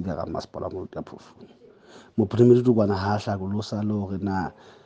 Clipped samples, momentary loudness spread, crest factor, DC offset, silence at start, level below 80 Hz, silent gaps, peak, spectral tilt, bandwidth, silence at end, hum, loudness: under 0.1%; 18 LU; 20 dB; under 0.1%; 0 s; -60 dBFS; none; -6 dBFS; -8 dB/octave; 7.8 kHz; 0.15 s; none; -24 LUFS